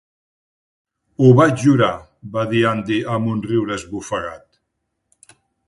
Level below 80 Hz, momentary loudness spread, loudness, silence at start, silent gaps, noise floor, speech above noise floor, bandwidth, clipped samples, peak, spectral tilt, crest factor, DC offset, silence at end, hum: -52 dBFS; 14 LU; -18 LUFS; 1.2 s; none; -74 dBFS; 58 dB; 11.5 kHz; under 0.1%; 0 dBFS; -7 dB/octave; 20 dB; under 0.1%; 1.3 s; none